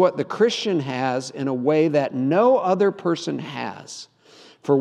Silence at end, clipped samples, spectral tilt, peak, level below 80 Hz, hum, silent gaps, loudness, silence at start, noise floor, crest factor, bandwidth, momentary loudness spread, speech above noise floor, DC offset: 0 s; under 0.1%; -6 dB/octave; -4 dBFS; -78 dBFS; none; none; -21 LUFS; 0 s; -50 dBFS; 18 dB; 10.5 kHz; 14 LU; 29 dB; under 0.1%